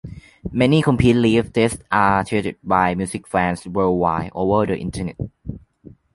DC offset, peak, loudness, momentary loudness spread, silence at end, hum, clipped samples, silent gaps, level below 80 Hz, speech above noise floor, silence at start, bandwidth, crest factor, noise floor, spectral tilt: under 0.1%; -2 dBFS; -19 LUFS; 16 LU; 0.25 s; none; under 0.1%; none; -40 dBFS; 28 dB; 0.05 s; 11.5 kHz; 18 dB; -46 dBFS; -6.5 dB/octave